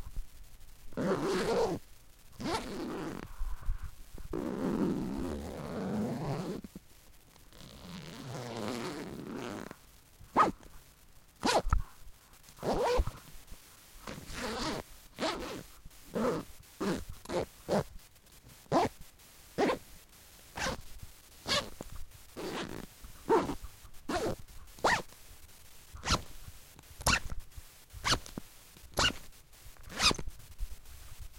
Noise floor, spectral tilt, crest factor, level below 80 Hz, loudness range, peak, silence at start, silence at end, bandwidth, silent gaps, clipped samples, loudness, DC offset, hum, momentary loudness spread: -58 dBFS; -4 dB/octave; 24 dB; -46 dBFS; 6 LU; -12 dBFS; 0 s; 0 s; 17 kHz; none; under 0.1%; -35 LUFS; under 0.1%; none; 23 LU